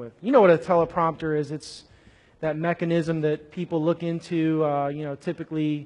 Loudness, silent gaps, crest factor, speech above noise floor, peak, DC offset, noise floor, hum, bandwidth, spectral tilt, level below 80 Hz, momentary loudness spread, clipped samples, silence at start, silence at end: -24 LUFS; none; 18 dB; 31 dB; -6 dBFS; under 0.1%; -55 dBFS; none; 11 kHz; -7.5 dB/octave; -60 dBFS; 13 LU; under 0.1%; 0 s; 0 s